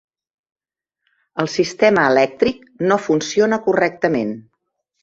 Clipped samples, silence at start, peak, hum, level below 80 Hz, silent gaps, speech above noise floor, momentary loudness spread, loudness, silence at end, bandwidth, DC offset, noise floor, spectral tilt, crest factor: under 0.1%; 1.35 s; -2 dBFS; none; -58 dBFS; none; 65 dB; 10 LU; -17 LUFS; 0.65 s; 7.8 kHz; under 0.1%; -82 dBFS; -5 dB/octave; 18 dB